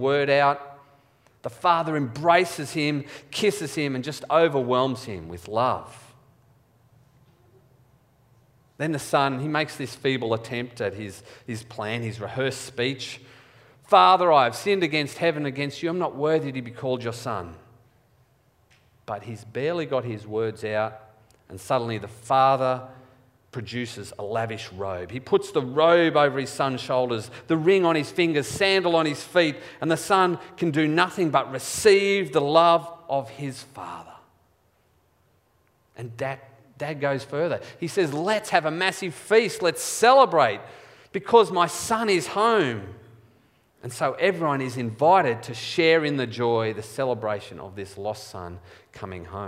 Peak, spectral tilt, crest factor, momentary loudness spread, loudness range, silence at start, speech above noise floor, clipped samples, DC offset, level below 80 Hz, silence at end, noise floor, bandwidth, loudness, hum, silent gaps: -2 dBFS; -4.5 dB/octave; 22 dB; 17 LU; 10 LU; 0 s; 41 dB; under 0.1%; under 0.1%; -64 dBFS; 0 s; -65 dBFS; 16 kHz; -23 LUFS; none; none